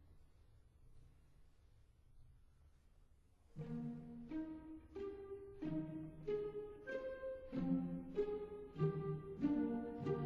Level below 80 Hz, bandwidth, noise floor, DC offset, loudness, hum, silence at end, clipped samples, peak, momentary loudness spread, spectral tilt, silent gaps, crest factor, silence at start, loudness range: -66 dBFS; 10.5 kHz; -69 dBFS; under 0.1%; -45 LUFS; none; 0 s; under 0.1%; -26 dBFS; 11 LU; -9.5 dB/octave; none; 20 dB; 0 s; 12 LU